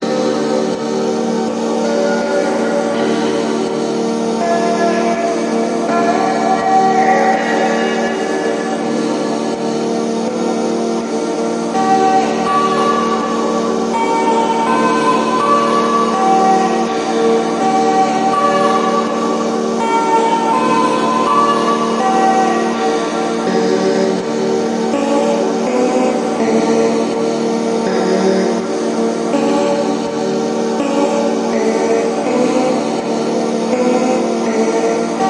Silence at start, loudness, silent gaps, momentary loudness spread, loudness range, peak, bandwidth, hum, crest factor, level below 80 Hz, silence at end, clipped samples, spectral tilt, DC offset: 0 s; -15 LUFS; none; 5 LU; 3 LU; 0 dBFS; 11 kHz; none; 14 dB; -58 dBFS; 0 s; under 0.1%; -4.5 dB/octave; under 0.1%